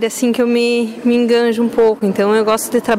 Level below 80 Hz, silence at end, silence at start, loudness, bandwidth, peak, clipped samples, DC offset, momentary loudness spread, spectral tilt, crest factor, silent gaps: -54 dBFS; 0 s; 0 s; -14 LUFS; 16 kHz; -4 dBFS; under 0.1%; under 0.1%; 3 LU; -4.5 dB/octave; 10 dB; none